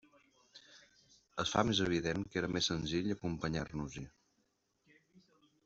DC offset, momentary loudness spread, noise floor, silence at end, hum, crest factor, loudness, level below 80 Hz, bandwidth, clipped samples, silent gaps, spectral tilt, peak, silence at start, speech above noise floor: under 0.1%; 17 LU; -79 dBFS; 0.45 s; none; 26 dB; -36 LUFS; -60 dBFS; 8 kHz; under 0.1%; none; -4.5 dB/octave; -14 dBFS; 0.55 s; 43 dB